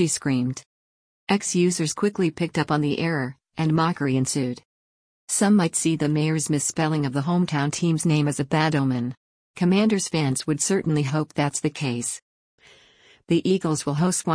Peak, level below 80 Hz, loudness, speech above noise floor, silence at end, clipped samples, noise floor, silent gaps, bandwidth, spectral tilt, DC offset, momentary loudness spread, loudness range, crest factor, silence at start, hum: -8 dBFS; -60 dBFS; -23 LUFS; 33 dB; 0 s; under 0.1%; -55 dBFS; 0.66-1.27 s, 4.65-5.28 s, 9.17-9.54 s, 12.22-12.58 s; 10.5 kHz; -5 dB/octave; under 0.1%; 7 LU; 3 LU; 16 dB; 0 s; none